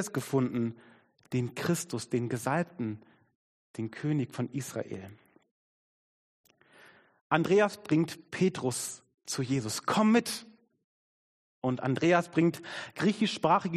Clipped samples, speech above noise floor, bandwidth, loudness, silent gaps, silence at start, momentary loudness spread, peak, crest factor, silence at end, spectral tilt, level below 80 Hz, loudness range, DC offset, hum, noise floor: under 0.1%; 29 dB; 13.5 kHz; -30 LUFS; 3.35-3.74 s, 5.51-6.44 s, 7.21-7.30 s, 9.14-9.18 s, 10.84-11.62 s; 0 s; 14 LU; -8 dBFS; 24 dB; 0 s; -5.5 dB/octave; -72 dBFS; 9 LU; under 0.1%; none; -59 dBFS